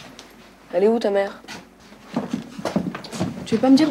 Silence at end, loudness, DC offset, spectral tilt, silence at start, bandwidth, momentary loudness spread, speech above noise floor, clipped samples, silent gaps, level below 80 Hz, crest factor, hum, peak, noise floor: 0 s; -23 LUFS; under 0.1%; -6 dB/octave; 0 s; 13 kHz; 21 LU; 29 dB; under 0.1%; none; -58 dBFS; 18 dB; none; -6 dBFS; -46 dBFS